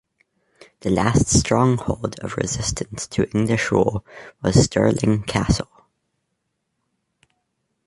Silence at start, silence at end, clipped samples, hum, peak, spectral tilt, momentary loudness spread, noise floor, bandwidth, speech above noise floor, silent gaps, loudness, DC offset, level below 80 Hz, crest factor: 0.85 s; 2.25 s; under 0.1%; none; 0 dBFS; -5 dB/octave; 10 LU; -75 dBFS; 11.5 kHz; 55 dB; none; -20 LUFS; under 0.1%; -38 dBFS; 22 dB